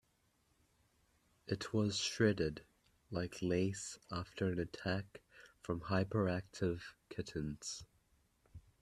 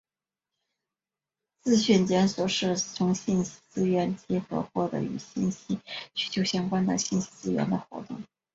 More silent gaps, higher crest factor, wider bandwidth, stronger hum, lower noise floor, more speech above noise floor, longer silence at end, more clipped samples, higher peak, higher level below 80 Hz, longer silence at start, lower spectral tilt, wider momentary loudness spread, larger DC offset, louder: neither; about the same, 24 dB vs 20 dB; first, 13 kHz vs 7.8 kHz; neither; second, -77 dBFS vs under -90 dBFS; second, 38 dB vs over 63 dB; about the same, 0.2 s vs 0.3 s; neither; second, -18 dBFS vs -10 dBFS; about the same, -64 dBFS vs -62 dBFS; second, 1.45 s vs 1.65 s; about the same, -5 dB/octave vs -5 dB/octave; first, 14 LU vs 11 LU; neither; second, -40 LUFS vs -28 LUFS